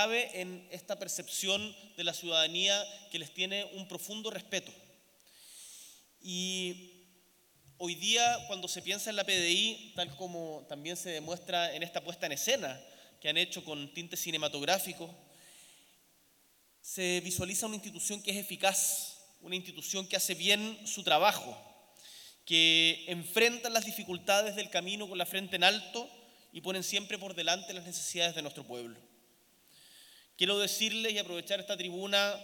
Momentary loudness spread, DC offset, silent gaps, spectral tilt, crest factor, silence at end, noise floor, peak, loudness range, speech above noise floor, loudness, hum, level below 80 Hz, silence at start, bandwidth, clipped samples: 16 LU; under 0.1%; none; -1.5 dB/octave; 26 dB; 0 s; -68 dBFS; -8 dBFS; 9 LU; 34 dB; -32 LUFS; none; -78 dBFS; 0 s; 19 kHz; under 0.1%